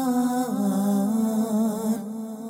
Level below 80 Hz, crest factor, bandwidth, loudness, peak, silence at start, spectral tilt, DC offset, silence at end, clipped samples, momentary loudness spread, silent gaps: -70 dBFS; 10 dB; 16 kHz; -24 LUFS; -14 dBFS; 0 s; -6.5 dB/octave; under 0.1%; 0 s; under 0.1%; 5 LU; none